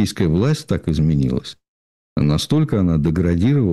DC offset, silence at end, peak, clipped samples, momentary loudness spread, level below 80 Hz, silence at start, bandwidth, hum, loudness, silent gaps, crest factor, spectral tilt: under 0.1%; 0 s; -8 dBFS; under 0.1%; 5 LU; -34 dBFS; 0 s; 12.5 kHz; none; -18 LUFS; 1.68-2.16 s; 10 dB; -7 dB/octave